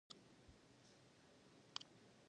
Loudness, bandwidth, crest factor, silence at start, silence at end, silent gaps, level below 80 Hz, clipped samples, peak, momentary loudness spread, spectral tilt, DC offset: -60 LUFS; 10 kHz; 38 dB; 0.1 s; 0 s; none; -82 dBFS; under 0.1%; -26 dBFS; 14 LU; -2.5 dB/octave; under 0.1%